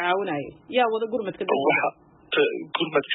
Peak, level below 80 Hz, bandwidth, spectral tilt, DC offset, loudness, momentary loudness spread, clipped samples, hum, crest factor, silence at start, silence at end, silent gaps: -8 dBFS; -68 dBFS; 4.1 kHz; -9 dB/octave; under 0.1%; -25 LUFS; 7 LU; under 0.1%; none; 16 dB; 0 s; 0 s; none